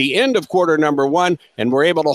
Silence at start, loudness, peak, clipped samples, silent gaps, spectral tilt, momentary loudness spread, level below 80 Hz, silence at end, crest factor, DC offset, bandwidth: 0 s; -16 LUFS; -2 dBFS; under 0.1%; none; -5 dB/octave; 4 LU; -64 dBFS; 0 s; 14 dB; under 0.1%; 15 kHz